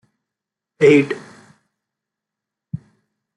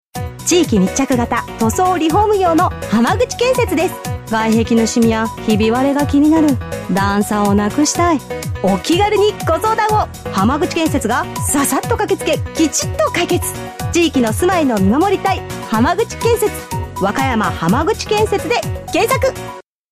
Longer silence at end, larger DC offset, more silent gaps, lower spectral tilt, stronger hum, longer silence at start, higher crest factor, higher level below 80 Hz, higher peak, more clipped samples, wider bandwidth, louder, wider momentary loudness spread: first, 0.6 s vs 0.3 s; neither; neither; first, -6.5 dB/octave vs -5 dB/octave; neither; first, 0.8 s vs 0.15 s; first, 20 dB vs 12 dB; second, -64 dBFS vs -34 dBFS; about the same, -2 dBFS vs -2 dBFS; neither; second, 10 kHz vs 15.5 kHz; about the same, -15 LUFS vs -15 LUFS; first, 21 LU vs 6 LU